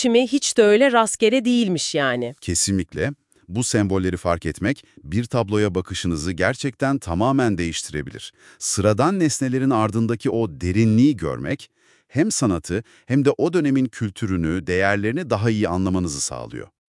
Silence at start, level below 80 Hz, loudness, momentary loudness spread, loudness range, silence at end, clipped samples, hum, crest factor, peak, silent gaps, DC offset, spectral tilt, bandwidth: 0 s; -50 dBFS; -21 LUFS; 10 LU; 3 LU; 0.25 s; under 0.1%; none; 18 dB; -2 dBFS; none; under 0.1%; -5 dB/octave; 12 kHz